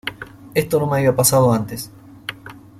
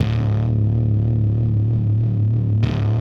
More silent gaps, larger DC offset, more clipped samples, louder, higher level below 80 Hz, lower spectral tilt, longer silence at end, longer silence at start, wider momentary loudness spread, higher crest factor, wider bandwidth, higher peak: neither; neither; neither; about the same, -17 LUFS vs -19 LUFS; second, -50 dBFS vs -32 dBFS; second, -4.5 dB/octave vs -10 dB/octave; first, 0.2 s vs 0 s; about the same, 0.05 s vs 0 s; first, 20 LU vs 1 LU; first, 20 dB vs 10 dB; first, 16.5 kHz vs 5.2 kHz; first, 0 dBFS vs -6 dBFS